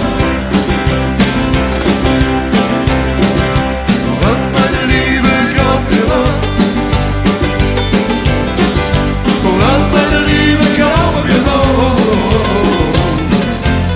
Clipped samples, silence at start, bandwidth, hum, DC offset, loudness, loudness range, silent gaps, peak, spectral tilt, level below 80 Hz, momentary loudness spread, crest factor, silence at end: under 0.1%; 0 s; 4 kHz; none; under 0.1%; -12 LUFS; 2 LU; none; 0 dBFS; -10.5 dB/octave; -20 dBFS; 4 LU; 12 dB; 0 s